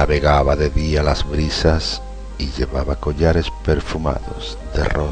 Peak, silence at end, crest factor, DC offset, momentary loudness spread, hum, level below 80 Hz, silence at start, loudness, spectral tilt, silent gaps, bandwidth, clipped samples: 0 dBFS; 0 s; 18 dB; under 0.1%; 12 LU; none; -24 dBFS; 0 s; -19 LUFS; -6 dB/octave; none; 9.4 kHz; under 0.1%